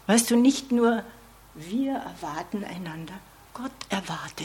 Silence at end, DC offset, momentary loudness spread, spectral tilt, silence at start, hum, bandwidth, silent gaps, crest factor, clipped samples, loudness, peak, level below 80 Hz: 0 s; under 0.1%; 21 LU; -4 dB/octave; 0.1 s; none; 16.5 kHz; none; 22 dB; under 0.1%; -26 LUFS; -4 dBFS; -58 dBFS